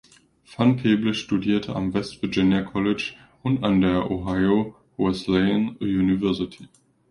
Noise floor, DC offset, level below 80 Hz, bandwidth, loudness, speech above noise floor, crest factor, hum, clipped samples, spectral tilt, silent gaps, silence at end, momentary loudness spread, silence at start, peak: -52 dBFS; under 0.1%; -48 dBFS; 11 kHz; -23 LUFS; 30 dB; 16 dB; none; under 0.1%; -7 dB/octave; none; 0.45 s; 7 LU; 0.5 s; -6 dBFS